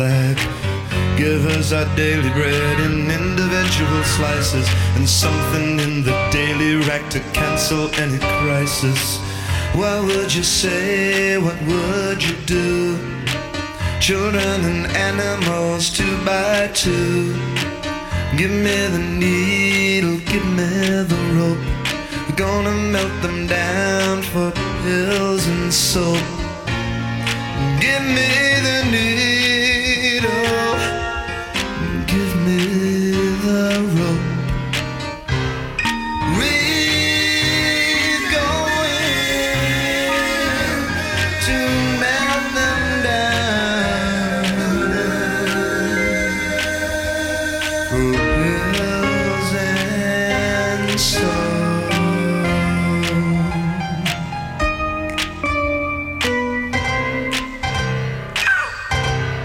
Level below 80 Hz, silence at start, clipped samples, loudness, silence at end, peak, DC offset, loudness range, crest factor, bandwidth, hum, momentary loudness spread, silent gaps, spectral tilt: -34 dBFS; 0 s; under 0.1%; -18 LUFS; 0 s; -2 dBFS; under 0.1%; 3 LU; 16 dB; 17 kHz; none; 7 LU; none; -4.5 dB/octave